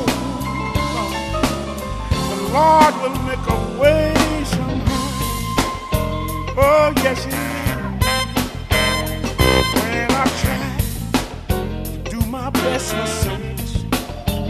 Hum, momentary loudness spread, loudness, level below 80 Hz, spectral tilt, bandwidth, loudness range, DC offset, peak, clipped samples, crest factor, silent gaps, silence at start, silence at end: none; 9 LU; -19 LUFS; -28 dBFS; -5 dB/octave; 14 kHz; 5 LU; under 0.1%; 0 dBFS; under 0.1%; 18 dB; none; 0 s; 0 s